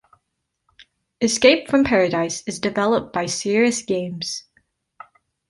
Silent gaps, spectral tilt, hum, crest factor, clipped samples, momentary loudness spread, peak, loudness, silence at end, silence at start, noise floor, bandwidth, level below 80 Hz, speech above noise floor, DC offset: none; -3.5 dB/octave; none; 20 dB; under 0.1%; 11 LU; -2 dBFS; -20 LUFS; 1.1 s; 0.8 s; -76 dBFS; 11.5 kHz; -54 dBFS; 57 dB; under 0.1%